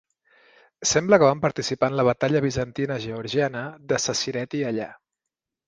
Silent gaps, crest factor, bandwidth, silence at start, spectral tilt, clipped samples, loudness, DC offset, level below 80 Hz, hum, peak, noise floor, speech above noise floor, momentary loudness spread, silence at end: none; 22 dB; 10 kHz; 0.8 s; -4 dB/octave; under 0.1%; -23 LUFS; under 0.1%; -56 dBFS; none; -2 dBFS; -86 dBFS; 63 dB; 10 LU; 0.75 s